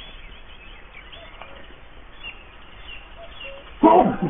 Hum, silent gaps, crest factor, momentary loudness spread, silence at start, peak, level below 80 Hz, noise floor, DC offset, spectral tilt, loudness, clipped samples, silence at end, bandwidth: none; none; 22 dB; 28 LU; 0 s; -2 dBFS; -44 dBFS; -42 dBFS; under 0.1%; -3.5 dB/octave; -16 LUFS; under 0.1%; 0 s; 3.8 kHz